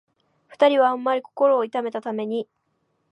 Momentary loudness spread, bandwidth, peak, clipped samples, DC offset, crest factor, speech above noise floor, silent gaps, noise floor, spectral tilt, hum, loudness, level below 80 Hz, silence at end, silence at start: 11 LU; 8.2 kHz; -6 dBFS; under 0.1%; under 0.1%; 18 dB; 50 dB; none; -71 dBFS; -6 dB/octave; none; -22 LUFS; -84 dBFS; 0.7 s; 0.6 s